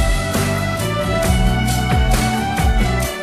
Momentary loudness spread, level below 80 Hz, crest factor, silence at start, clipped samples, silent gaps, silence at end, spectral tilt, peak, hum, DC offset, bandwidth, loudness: 3 LU; -20 dBFS; 14 dB; 0 s; under 0.1%; none; 0 s; -5 dB/octave; -2 dBFS; none; under 0.1%; 15 kHz; -18 LUFS